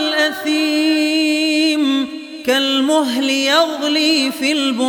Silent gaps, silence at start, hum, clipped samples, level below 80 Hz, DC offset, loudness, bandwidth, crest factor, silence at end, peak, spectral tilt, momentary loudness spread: none; 0 s; none; under 0.1%; -66 dBFS; under 0.1%; -15 LUFS; 19 kHz; 14 dB; 0 s; -2 dBFS; -1.5 dB/octave; 4 LU